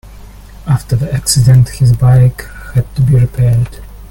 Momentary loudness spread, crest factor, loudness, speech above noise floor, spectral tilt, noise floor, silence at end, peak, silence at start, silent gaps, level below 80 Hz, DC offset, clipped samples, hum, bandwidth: 10 LU; 10 dB; -11 LUFS; 23 dB; -6 dB/octave; -32 dBFS; 0.05 s; 0 dBFS; 0.1 s; none; -28 dBFS; under 0.1%; under 0.1%; none; 16.5 kHz